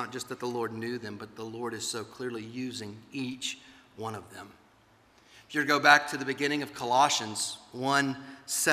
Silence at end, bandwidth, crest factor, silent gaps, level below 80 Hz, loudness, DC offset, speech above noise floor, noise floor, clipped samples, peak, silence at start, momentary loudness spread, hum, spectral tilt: 0 s; 15.5 kHz; 26 dB; none; -74 dBFS; -29 LUFS; under 0.1%; 32 dB; -62 dBFS; under 0.1%; -4 dBFS; 0 s; 18 LU; none; -2.5 dB/octave